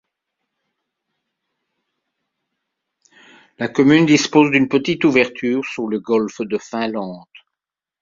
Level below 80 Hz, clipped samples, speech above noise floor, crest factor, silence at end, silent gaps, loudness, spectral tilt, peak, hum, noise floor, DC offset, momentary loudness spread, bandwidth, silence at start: -60 dBFS; under 0.1%; 69 dB; 18 dB; 0.85 s; none; -17 LUFS; -5 dB/octave; -2 dBFS; none; -86 dBFS; under 0.1%; 12 LU; 7.6 kHz; 3.6 s